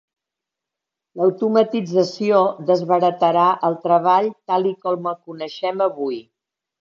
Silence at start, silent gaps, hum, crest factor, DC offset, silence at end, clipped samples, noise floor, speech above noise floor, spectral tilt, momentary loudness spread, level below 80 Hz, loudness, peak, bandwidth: 1.15 s; none; none; 18 dB; under 0.1%; 0.6 s; under 0.1%; -85 dBFS; 67 dB; -6.5 dB/octave; 11 LU; -74 dBFS; -19 LUFS; -2 dBFS; 7.4 kHz